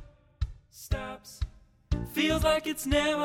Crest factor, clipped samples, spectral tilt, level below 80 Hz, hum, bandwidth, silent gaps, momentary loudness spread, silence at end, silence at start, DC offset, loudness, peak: 18 dB; under 0.1%; -4.5 dB/octave; -38 dBFS; none; 18 kHz; none; 14 LU; 0 s; 0 s; under 0.1%; -30 LUFS; -14 dBFS